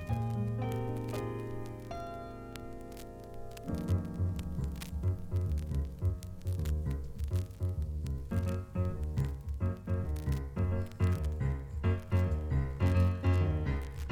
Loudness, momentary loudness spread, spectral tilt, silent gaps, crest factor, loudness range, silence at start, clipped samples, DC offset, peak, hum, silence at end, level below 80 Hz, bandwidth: -35 LUFS; 12 LU; -8 dB/octave; none; 16 dB; 7 LU; 0 s; under 0.1%; under 0.1%; -18 dBFS; none; 0 s; -40 dBFS; 15.5 kHz